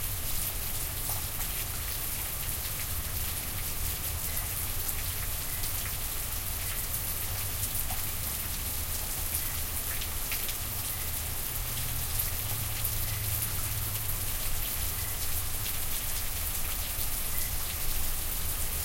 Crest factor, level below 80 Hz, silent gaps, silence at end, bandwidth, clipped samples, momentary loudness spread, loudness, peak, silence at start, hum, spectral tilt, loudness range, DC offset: 20 dB; -38 dBFS; none; 0 s; 17 kHz; under 0.1%; 2 LU; -31 LUFS; -12 dBFS; 0 s; none; -2 dB/octave; 1 LU; under 0.1%